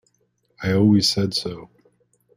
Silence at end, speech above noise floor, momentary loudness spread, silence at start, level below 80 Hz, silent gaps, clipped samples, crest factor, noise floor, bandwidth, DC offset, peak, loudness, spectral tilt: 0.7 s; 48 dB; 16 LU; 0.6 s; -56 dBFS; none; under 0.1%; 16 dB; -67 dBFS; 16 kHz; under 0.1%; -6 dBFS; -19 LUFS; -5.5 dB/octave